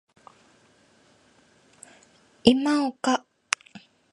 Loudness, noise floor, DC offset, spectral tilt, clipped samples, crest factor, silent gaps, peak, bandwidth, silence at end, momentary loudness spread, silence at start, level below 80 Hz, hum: -24 LUFS; -60 dBFS; under 0.1%; -3.5 dB/octave; under 0.1%; 28 dB; none; -2 dBFS; 11.5 kHz; 0.35 s; 9 LU; 2.45 s; -62 dBFS; none